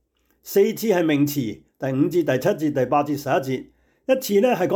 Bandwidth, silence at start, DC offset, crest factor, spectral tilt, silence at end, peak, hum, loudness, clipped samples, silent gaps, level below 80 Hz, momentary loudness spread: 19.5 kHz; 0.45 s; under 0.1%; 14 dB; -6 dB/octave; 0 s; -8 dBFS; none; -22 LUFS; under 0.1%; none; -62 dBFS; 10 LU